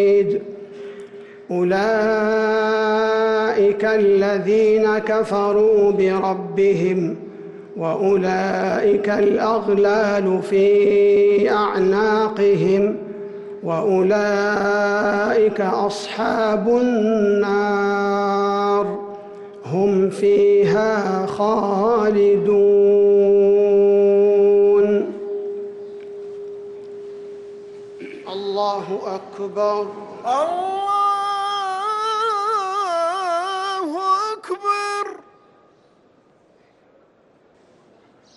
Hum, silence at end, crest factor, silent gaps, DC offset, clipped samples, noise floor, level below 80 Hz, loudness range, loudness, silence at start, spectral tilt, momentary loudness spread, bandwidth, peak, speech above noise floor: none; 3.2 s; 10 dB; none; under 0.1%; under 0.1%; -55 dBFS; -58 dBFS; 10 LU; -18 LUFS; 0 s; -6 dB/octave; 19 LU; 11 kHz; -8 dBFS; 38 dB